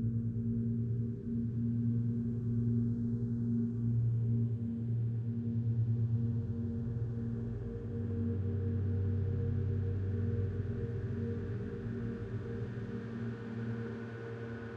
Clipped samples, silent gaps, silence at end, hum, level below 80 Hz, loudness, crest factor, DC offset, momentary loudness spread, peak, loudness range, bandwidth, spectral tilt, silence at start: under 0.1%; none; 0 s; none; -52 dBFS; -36 LUFS; 12 dB; under 0.1%; 7 LU; -22 dBFS; 5 LU; 3.7 kHz; -11 dB/octave; 0 s